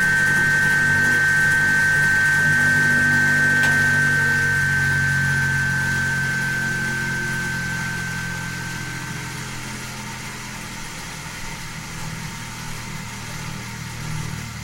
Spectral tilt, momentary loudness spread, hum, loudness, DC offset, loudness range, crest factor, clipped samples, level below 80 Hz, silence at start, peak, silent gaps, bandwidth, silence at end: -3.5 dB/octave; 15 LU; none; -18 LUFS; under 0.1%; 15 LU; 14 dB; under 0.1%; -42 dBFS; 0 s; -8 dBFS; none; 16.5 kHz; 0 s